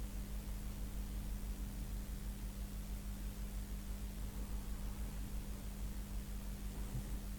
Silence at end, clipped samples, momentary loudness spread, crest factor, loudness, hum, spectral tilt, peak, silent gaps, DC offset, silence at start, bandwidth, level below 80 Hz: 0 s; under 0.1%; 1 LU; 12 dB; -47 LUFS; 50 Hz at -55 dBFS; -5.5 dB/octave; -32 dBFS; none; under 0.1%; 0 s; 19 kHz; -44 dBFS